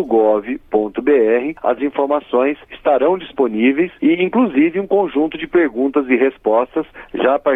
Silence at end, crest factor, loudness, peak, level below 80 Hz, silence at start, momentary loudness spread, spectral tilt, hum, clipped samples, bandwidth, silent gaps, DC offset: 0 s; 12 dB; -16 LUFS; -4 dBFS; -52 dBFS; 0 s; 5 LU; -8.5 dB/octave; none; under 0.1%; 3.8 kHz; none; under 0.1%